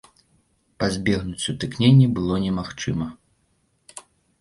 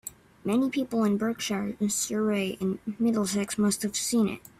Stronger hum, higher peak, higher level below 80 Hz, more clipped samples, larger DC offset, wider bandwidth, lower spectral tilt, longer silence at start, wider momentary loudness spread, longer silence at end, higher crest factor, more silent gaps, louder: neither; first, -4 dBFS vs -14 dBFS; first, -46 dBFS vs -64 dBFS; neither; neither; second, 11.5 kHz vs 15.5 kHz; first, -6 dB/octave vs -4.5 dB/octave; first, 0.8 s vs 0.05 s; first, 26 LU vs 5 LU; first, 0.4 s vs 0.1 s; about the same, 18 dB vs 14 dB; neither; first, -22 LUFS vs -27 LUFS